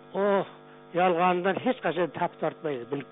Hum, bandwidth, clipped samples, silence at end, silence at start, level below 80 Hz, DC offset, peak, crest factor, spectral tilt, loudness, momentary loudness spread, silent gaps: none; 4 kHz; under 0.1%; 0.05 s; 0.05 s; -72 dBFS; under 0.1%; -10 dBFS; 18 dB; -4.5 dB/octave; -27 LUFS; 10 LU; none